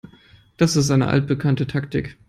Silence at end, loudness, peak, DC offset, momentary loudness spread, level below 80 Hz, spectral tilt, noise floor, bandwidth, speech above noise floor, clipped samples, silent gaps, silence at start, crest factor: 0.15 s; -20 LUFS; -2 dBFS; under 0.1%; 7 LU; -48 dBFS; -6 dB/octave; -51 dBFS; 13.5 kHz; 32 dB; under 0.1%; none; 0.6 s; 18 dB